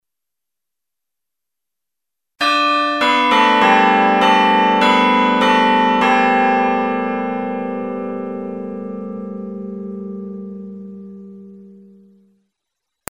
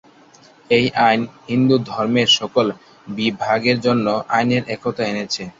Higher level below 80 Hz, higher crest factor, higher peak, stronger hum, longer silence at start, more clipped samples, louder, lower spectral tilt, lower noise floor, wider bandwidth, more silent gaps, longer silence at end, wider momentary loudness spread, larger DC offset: second, -64 dBFS vs -56 dBFS; about the same, 18 dB vs 16 dB; about the same, 0 dBFS vs -2 dBFS; neither; first, 2.4 s vs 0.7 s; neither; first, -14 LUFS vs -18 LUFS; about the same, -4.5 dB/octave vs -5 dB/octave; first, -85 dBFS vs -48 dBFS; first, 14 kHz vs 7.8 kHz; neither; first, 1.4 s vs 0.1 s; first, 18 LU vs 9 LU; neither